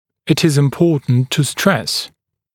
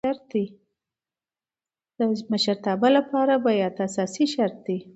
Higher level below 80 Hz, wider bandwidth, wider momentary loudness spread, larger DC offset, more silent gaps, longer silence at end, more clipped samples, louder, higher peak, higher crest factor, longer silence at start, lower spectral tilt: first, -54 dBFS vs -70 dBFS; first, 17.5 kHz vs 8.2 kHz; second, 6 LU vs 9 LU; neither; neither; first, 0.45 s vs 0.05 s; neither; first, -16 LUFS vs -24 LUFS; first, 0 dBFS vs -6 dBFS; about the same, 16 dB vs 18 dB; first, 0.25 s vs 0.05 s; about the same, -5.5 dB/octave vs -5 dB/octave